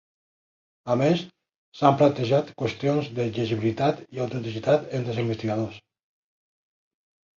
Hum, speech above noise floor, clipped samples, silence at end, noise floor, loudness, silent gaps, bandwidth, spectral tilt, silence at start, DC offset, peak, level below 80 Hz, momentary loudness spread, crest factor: none; over 66 dB; under 0.1%; 1.6 s; under -90 dBFS; -25 LUFS; 1.56-1.72 s; 7.6 kHz; -7.5 dB/octave; 0.85 s; under 0.1%; -4 dBFS; -60 dBFS; 9 LU; 22 dB